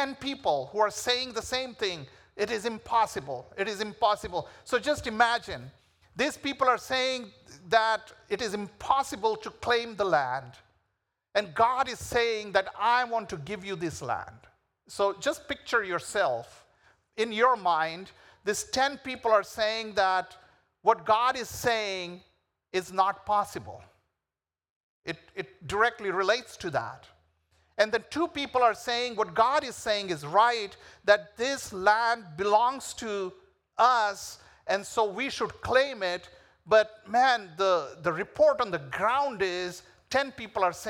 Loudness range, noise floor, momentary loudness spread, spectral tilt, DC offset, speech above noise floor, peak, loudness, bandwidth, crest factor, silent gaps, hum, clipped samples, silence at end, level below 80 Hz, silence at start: 5 LU; under -90 dBFS; 12 LU; -3 dB/octave; under 0.1%; over 62 dB; -8 dBFS; -28 LUFS; 18.5 kHz; 22 dB; 24.70-25.02 s; none; under 0.1%; 0 s; -62 dBFS; 0 s